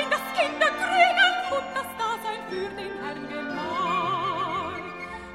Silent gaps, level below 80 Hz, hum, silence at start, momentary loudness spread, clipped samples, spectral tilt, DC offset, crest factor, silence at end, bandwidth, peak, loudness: none; -60 dBFS; none; 0 s; 13 LU; under 0.1%; -3 dB/octave; under 0.1%; 20 dB; 0 s; 16 kHz; -6 dBFS; -25 LUFS